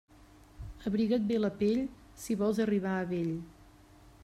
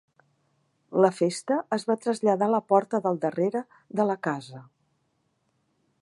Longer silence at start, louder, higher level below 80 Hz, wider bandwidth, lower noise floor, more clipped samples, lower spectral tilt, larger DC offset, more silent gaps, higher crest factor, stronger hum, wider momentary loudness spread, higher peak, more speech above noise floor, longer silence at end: second, 0.55 s vs 0.9 s; second, -32 LUFS vs -26 LUFS; first, -56 dBFS vs -80 dBFS; first, 13 kHz vs 11.5 kHz; second, -57 dBFS vs -73 dBFS; neither; about the same, -7 dB/octave vs -6 dB/octave; neither; neither; second, 14 dB vs 22 dB; neither; first, 17 LU vs 9 LU; second, -18 dBFS vs -4 dBFS; second, 27 dB vs 48 dB; second, 0.6 s vs 1.4 s